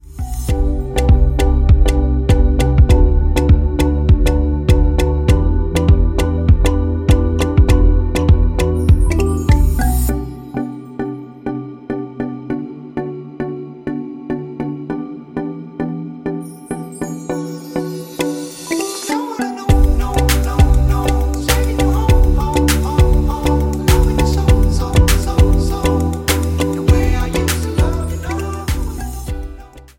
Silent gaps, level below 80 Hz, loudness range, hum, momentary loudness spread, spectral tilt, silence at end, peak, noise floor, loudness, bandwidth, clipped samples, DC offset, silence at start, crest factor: none; -16 dBFS; 11 LU; none; 12 LU; -6.5 dB/octave; 0.15 s; 0 dBFS; -35 dBFS; -16 LUFS; 17 kHz; under 0.1%; under 0.1%; 0.05 s; 14 dB